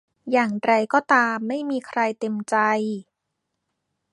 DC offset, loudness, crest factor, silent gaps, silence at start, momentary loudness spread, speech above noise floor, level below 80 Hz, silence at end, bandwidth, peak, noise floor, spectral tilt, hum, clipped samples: under 0.1%; -22 LUFS; 20 dB; none; 0.25 s; 8 LU; 58 dB; -74 dBFS; 1.1 s; 11.5 kHz; -4 dBFS; -79 dBFS; -5 dB/octave; none; under 0.1%